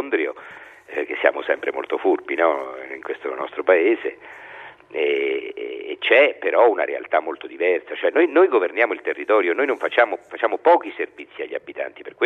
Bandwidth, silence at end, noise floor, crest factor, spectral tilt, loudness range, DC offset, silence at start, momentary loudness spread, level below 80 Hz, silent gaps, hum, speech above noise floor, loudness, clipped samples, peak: 4.4 kHz; 0 s; -42 dBFS; 20 dB; -4.5 dB/octave; 5 LU; under 0.1%; 0 s; 15 LU; -74 dBFS; none; none; 21 dB; -21 LUFS; under 0.1%; 0 dBFS